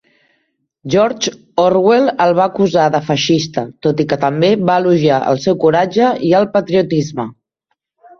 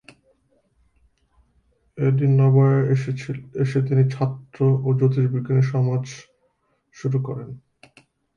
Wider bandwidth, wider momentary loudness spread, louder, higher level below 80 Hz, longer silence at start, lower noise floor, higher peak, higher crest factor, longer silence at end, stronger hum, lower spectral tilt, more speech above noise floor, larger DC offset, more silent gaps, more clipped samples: about the same, 7.2 kHz vs 7 kHz; second, 7 LU vs 14 LU; first, -14 LUFS vs -21 LUFS; first, -54 dBFS vs -60 dBFS; second, 0.85 s vs 1.95 s; about the same, -71 dBFS vs -68 dBFS; first, 0 dBFS vs -8 dBFS; about the same, 14 dB vs 14 dB; about the same, 0.85 s vs 0.8 s; neither; second, -5.5 dB/octave vs -9 dB/octave; first, 58 dB vs 48 dB; neither; neither; neither